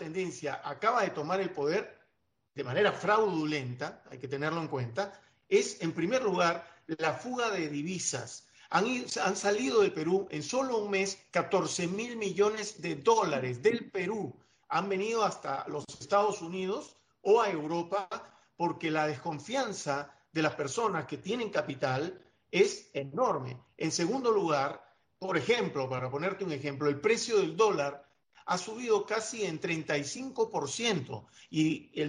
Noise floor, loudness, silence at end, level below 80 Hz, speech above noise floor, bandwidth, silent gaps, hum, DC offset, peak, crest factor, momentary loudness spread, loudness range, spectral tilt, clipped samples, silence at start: -78 dBFS; -31 LUFS; 0 s; -74 dBFS; 47 dB; 10.5 kHz; none; none; under 0.1%; -12 dBFS; 20 dB; 10 LU; 2 LU; -4.5 dB/octave; under 0.1%; 0 s